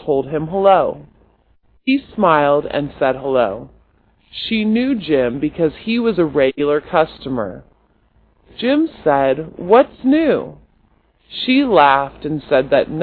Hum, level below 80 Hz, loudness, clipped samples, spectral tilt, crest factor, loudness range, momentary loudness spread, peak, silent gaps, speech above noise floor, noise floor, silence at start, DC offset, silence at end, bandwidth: none; -48 dBFS; -16 LUFS; under 0.1%; -9.5 dB/octave; 16 dB; 3 LU; 11 LU; 0 dBFS; none; 41 dB; -57 dBFS; 0 s; under 0.1%; 0 s; 4.8 kHz